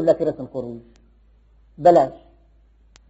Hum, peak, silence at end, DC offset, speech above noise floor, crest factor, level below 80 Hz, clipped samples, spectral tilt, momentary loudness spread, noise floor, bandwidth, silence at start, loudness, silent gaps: none; -2 dBFS; 0.95 s; under 0.1%; 35 dB; 20 dB; -54 dBFS; under 0.1%; -6.5 dB/octave; 19 LU; -54 dBFS; 8 kHz; 0 s; -19 LUFS; none